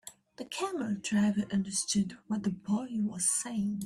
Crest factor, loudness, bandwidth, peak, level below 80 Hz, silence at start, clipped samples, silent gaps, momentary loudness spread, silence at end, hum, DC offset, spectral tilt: 14 dB; -32 LUFS; 14.5 kHz; -18 dBFS; -66 dBFS; 0.05 s; under 0.1%; none; 7 LU; 0 s; none; under 0.1%; -4 dB/octave